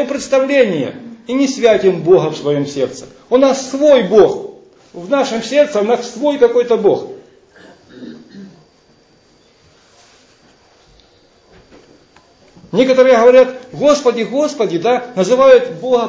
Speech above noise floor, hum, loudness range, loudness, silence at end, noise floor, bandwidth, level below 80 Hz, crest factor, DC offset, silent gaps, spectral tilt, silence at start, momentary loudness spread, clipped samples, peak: 39 dB; none; 6 LU; -13 LUFS; 0 s; -51 dBFS; 8 kHz; -56 dBFS; 14 dB; under 0.1%; none; -5 dB/octave; 0 s; 13 LU; under 0.1%; 0 dBFS